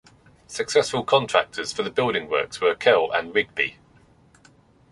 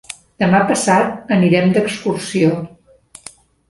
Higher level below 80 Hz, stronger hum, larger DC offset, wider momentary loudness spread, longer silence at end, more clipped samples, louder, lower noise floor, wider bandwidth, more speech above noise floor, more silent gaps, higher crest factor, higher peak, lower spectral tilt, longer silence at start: second, -60 dBFS vs -54 dBFS; neither; neither; second, 8 LU vs 21 LU; first, 1.2 s vs 1 s; neither; second, -22 LUFS vs -15 LUFS; first, -56 dBFS vs -45 dBFS; about the same, 11.5 kHz vs 11.5 kHz; about the same, 33 dB vs 31 dB; neither; first, 22 dB vs 16 dB; about the same, -2 dBFS vs -2 dBFS; second, -3 dB/octave vs -5.5 dB/octave; first, 0.5 s vs 0.1 s